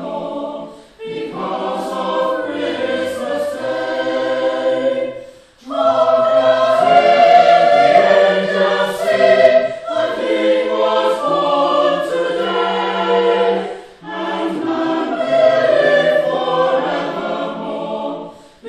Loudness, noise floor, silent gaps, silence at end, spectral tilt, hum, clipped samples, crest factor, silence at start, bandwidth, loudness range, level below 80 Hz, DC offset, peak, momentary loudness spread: -15 LUFS; -38 dBFS; none; 0 s; -5 dB/octave; none; under 0.1%; 16 dB; 0 s; 13 kHz; 8 LU; -58 dBFS; under 0.1%; 0 dBFS; 14 LU